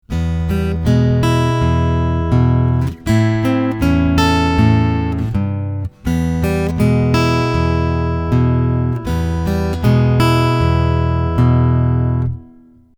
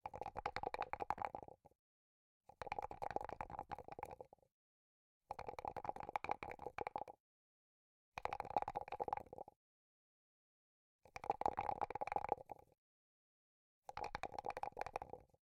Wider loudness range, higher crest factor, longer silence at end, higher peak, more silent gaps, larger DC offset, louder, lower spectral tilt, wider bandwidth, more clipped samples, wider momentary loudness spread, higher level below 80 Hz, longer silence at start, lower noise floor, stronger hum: second, 1 LU vs 4 LU; second, 14 dB vs 28 dB; first, 0.55 s vs 0.15 s; first, 0 dBFS vs -22 dBFS; second, none vs 1.79-2.41 s, 4.52-5.20 s, 7.20-8.12 s, 9.56-10.99 s, 12.78-13.82 s; neither; first, -15 LUFS vs -47 LUFS; first, -7.5 dB/octave vs -5 dB/octave; first, 18.5 kHz vs 15.5 kHz; neither; second, 6 LU vs 13 LU; first, -26 dBFS vs -70 dBFS; about the same, 0.1 s vs 0.05 s; second, -44 dBFS vs under -90 dBFS; neither